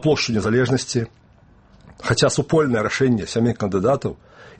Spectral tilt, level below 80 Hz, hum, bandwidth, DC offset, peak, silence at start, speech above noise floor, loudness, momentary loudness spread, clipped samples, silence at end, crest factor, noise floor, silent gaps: -5 dB/octave; -48 dBFS; none; 8.8 kHz; under 0.1%; -2 dBFS; 0 s; 32 dB; -20 LUFS; 9 LU; under 0.1%; 0.1 s; 18 dB; -51 dBFS; none